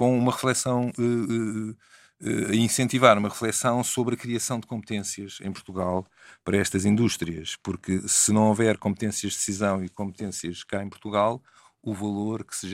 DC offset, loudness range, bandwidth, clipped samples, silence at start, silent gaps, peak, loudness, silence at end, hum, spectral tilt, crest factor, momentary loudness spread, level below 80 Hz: under 0.1%; 5 LU; 16 kHz; under 0.1%; 0 s; none; 0 dBFS; -25 LUFS; 0 s; none; -4.5 dB/octave; 24 dB; 14 LU; -60 dBFS